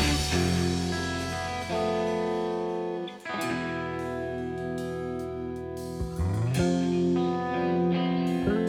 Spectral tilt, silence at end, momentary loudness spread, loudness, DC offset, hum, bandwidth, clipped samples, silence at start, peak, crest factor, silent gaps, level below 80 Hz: -5.5 dB/octave; 0 s; 9 LU; -29 LUFS; under 0.1%; none; 15.5 kHz; under 0.1%; 0 s; -12 dBFS; 16 dB; none; -46 dBFS